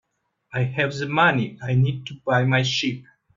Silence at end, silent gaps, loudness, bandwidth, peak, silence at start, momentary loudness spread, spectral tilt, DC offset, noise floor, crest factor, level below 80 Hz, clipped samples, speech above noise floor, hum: 0.35 s; none; -22 LUFS; 7.4 kHz; -4 dBFS; 0.55 s; 10 LU; -5.5 dB/octave; under 0.1%; -63 dBFS; 18 dB; -60 dBFS; under 0.1%; 41 dB; none